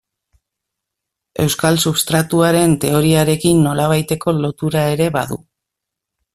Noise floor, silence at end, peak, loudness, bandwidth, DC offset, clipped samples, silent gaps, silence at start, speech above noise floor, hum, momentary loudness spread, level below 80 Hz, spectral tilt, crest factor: -81 dBFS; 1 s; 0 dBFS; -15 LUFS; 16 kHz; under 0.1%; under 0.1%; none; 1.4 s; 66 dB; none; 7 LU; -48 dBFS; -5 dB/octave; 16 dB